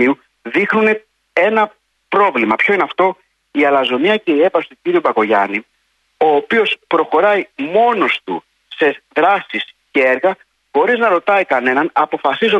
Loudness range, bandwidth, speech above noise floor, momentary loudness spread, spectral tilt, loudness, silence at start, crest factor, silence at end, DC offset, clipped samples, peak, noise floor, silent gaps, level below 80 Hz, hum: 1 LU; 9 kHz; 49 dB; 8 LU; -6 dB/octave; -15 LUFS; 0 s; 14 dB; 0 s; under 0.1%; under 0.1%; -2 dBFS; -63 dBFS; none; -66 dBFS; none